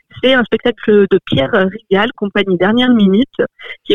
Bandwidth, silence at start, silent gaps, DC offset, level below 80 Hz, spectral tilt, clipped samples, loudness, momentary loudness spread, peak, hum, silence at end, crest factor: 6.6 kHz; 0.15 s; none; 1%; -48 dBFS; -7.5 dB/octave; under 0.1%; -13 LUFS; 6 LU; 0 dBFS; none; 0 s; 12 dB